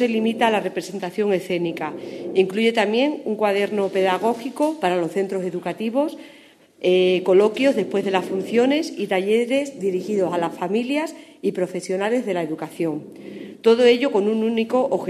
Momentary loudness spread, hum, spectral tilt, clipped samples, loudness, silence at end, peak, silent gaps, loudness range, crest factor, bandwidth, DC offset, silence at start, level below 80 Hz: 10 LU; none; -5.5 dB/octave; under 0.1%; -21 LUFS; 0 s; -2 dBFS; none; 4 LU; 18 dB; 13.5 kHz; under 0.1%; 0 s; -74 dBFS